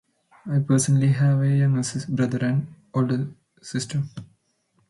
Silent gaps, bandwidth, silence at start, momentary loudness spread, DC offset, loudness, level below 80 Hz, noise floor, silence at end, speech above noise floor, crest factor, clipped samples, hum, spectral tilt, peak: none; 11.5 kHz; 0.45 s; 15 LU; under 0.1%; -23 LUFS; -62 dBFS; -68 dBFS; 0.65 s; 46 dB; 14 dB; under 0.1%; none; -6.5 dB/octave; -8 dBFS